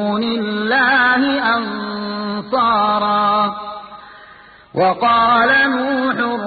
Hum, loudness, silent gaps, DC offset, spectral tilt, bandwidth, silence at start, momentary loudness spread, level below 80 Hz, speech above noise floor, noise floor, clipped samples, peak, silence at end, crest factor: none; -15 LUFS; none; under 0.1%; -10 dB/octave; 4.8 kHz; 0 s; 11 LU; -54 dBFS; 27 dB; -43 dBFS; under 0.1%; -2 dBFS; 0 s; 14 dB